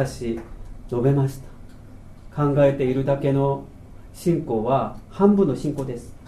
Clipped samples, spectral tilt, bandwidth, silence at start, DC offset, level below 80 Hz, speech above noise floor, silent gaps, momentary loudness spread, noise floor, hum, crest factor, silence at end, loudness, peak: under 0.1%; -8.5 dB/octave; 13.5 kHz; 0 s; under 0.1%; -42 dBFS; 20 dB; none; 14 LU; -41 dBFS; none; 20 dB; 0 s; -22 LUFS; -4 dBFS